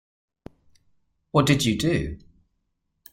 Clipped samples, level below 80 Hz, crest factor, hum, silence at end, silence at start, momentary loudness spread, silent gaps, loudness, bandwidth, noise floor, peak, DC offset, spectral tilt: under 0.1%; -46 dBFS; 22 dB; none; 0.95 s; 1.35 s; 14 LU; none; -23 LUFS; 16 kHz; -75 dBFS; -4 dBFS; under 0.1%; -5 dB/octave